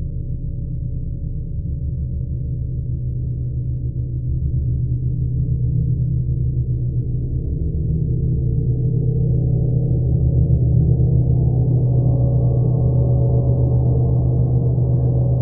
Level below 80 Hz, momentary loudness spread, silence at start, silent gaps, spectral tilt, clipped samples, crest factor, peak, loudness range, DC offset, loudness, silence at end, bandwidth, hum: -24 dBFS; 9 LU; 0 s; none; -19.5 dB/octave; under 0.1%; 14 dB; -4 dBFS; 8 LU; under 0.1%; -19 LUFS; 0 s; 1.2 kHz; none